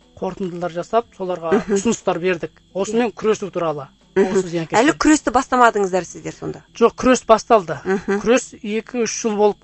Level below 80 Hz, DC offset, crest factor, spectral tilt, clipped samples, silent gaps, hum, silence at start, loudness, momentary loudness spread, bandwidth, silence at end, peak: -48 dBFS; under 0.1%; 18 dB; -4.5 dB/octave; under 0.1%; none; none; 0.2 s; -19 LUFS; 12 LU; 8.4 kHz; 0.1 s; 0 dBFS